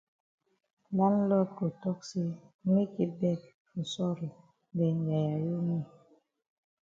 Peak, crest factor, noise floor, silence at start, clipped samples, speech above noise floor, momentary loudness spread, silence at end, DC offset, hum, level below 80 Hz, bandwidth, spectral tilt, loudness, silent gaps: -14 dBFS; 18 dB; -66 dBFS; 0.9 s; under 0.1%; 35 dB; 11 LU; 0.95 s; under 0.1%; none; -74 dBFS; 7.6 kHz; -8 dB/octave; -32 LUFS; 2.54-2.59 s, 3.54-3.65 s